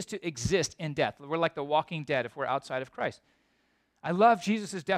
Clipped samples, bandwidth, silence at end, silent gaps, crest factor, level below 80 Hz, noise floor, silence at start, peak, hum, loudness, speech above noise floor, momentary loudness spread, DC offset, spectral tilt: under 0.1%; 14 kHz; 0 s; none; 20 dB; -58 dBFS; -72 dBFS; 0 s; -10 dBFS; none; -30 LUFS; 43 dB; 12 LU; under 0.1%; -4.5 dB/octave